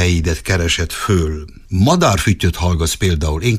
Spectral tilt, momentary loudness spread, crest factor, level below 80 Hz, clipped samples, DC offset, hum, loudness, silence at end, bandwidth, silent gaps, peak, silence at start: -5 dB/octave; 5 LU; 14 dB; -26 dBFS; under 0.1%; under 0.1%; none; -16 LUFS; 0 s; 15.5 kHz; none; -2 dBFS; 0 s